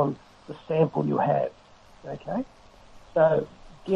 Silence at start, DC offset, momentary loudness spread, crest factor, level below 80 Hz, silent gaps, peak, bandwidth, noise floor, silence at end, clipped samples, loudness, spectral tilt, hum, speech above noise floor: 0 s; under 0.1%; 20 LU; 18 dB; -56 dBFS; none; -10 dBFS; 7.8 kHz; -50 dBFS; 0 s; under 0.1%; -26 LUFS; -9 dB/octave; none; 25 dB